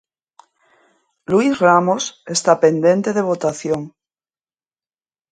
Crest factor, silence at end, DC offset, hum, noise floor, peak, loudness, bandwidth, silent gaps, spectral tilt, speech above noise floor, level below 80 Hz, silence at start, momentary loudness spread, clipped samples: 18 dB; 1.45 s; under 0.1%; none; under -90 dBFS; 0 dBFS; -17 LUFS; 9.6 kHz; none; -5 dB/octave; over 74 dB; -62 dBFS; 1.3 s; 10 LU; under 0.1%